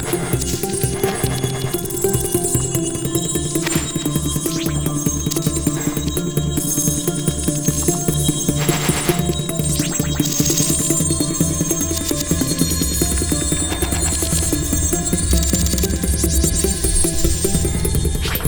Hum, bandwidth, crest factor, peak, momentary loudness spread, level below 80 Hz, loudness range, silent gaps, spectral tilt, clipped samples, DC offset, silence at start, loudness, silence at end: none; over 20 kHz; 18 dB; -2 dBFS; 4 LU; -26 dBFS; 2 LU; none; -4 dB/octave; under 0.1%; 0.2%; 0 s; -18 LUFS; 0 s